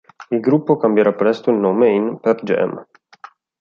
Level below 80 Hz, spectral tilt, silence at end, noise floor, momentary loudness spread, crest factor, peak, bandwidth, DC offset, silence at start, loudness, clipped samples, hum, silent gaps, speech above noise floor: -64 dBFS; -8.5 dB/octave; 0.8 s; -43 dBFS; 7 LU; 14 dB; -2 dBFS; 6.8 kHz; under 0.1%; 0.2 s; -17 LUFS; under 0.1%; none; none; 27 dB